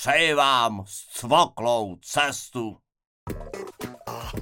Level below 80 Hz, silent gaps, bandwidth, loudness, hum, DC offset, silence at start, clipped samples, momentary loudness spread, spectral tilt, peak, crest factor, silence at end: -50 dBFS; 3.07-3.27 s; 17 kHz; -23 LUFS; none; under 0.1%; 0 s; under 0.1%; 18 LU; -3 dB/octave; -6 dBFS; 20 dB; 0 s